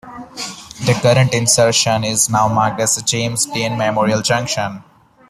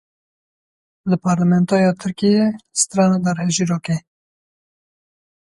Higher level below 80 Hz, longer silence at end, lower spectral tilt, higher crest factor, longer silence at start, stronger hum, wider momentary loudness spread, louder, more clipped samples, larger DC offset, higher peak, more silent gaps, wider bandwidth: first, -50 dBFS vs -58 dBFS; second, 0.5 s vs 1.5 s; second, -3.5 dB/octave vs -5.5 dB/octave; about the same, 16 dB vs 16 dB; second, 0.05 s vs 1.05 s; neither; first, 14 LU vs 7 LU; first, -15 LUFS vs -18 LUFS; neither; neither; first, 0 dBFS vs -4 dBFS; neither; first, 15 kHz vs 11.5 kHz